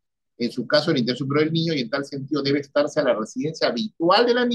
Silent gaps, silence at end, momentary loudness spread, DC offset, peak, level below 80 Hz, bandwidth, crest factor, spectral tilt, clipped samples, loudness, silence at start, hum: none; 0 s; 10 LU; under 0.1%; -6 dBFS; -72 dBFS; 11 kHz; 16 dB; -5.5 dB/octave; under 0.1%; -22 LUFS; 0.4 s; none